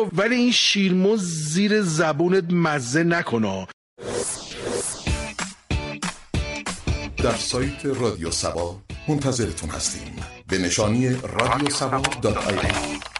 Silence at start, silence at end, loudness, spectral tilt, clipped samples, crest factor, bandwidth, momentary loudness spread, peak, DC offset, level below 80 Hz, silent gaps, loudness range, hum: 0 s; 0 s; -23 LUFS; -4 dB/octave; under 0.1%; 20 dB; 11.5 kHz; 10 LU; -4 dBFS; under 0.1%; -38 dBFS; 3.73-3.96 s; 7 LU; none